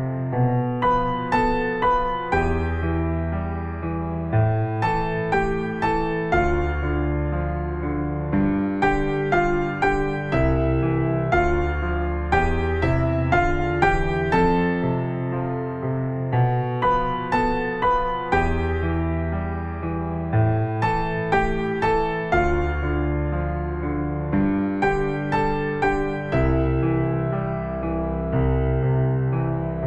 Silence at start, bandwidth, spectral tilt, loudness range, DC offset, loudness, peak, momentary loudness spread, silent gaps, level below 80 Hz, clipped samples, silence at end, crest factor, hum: 0 s; 8.8 kHz; -8.5 dB/octave; 2 LU; under 0.1%; -23 LUFS; -4 dBFS; 5 LU; none; -30 dBFS; under 0.1%; 0 s; 18 dB; none